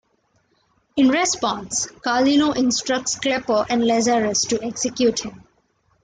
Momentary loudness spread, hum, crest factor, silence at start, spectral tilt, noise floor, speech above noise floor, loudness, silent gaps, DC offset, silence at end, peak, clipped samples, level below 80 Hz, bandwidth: 7 LU; none; 14 dB; 0.95 s; -2.5 dB/octave; -65 dBFS; 45 dB; -20 LUFS; none; under 0.1%; 0.65 s; -6 dBFS; under 0.1%; -56 dBFS; 9.6 kHz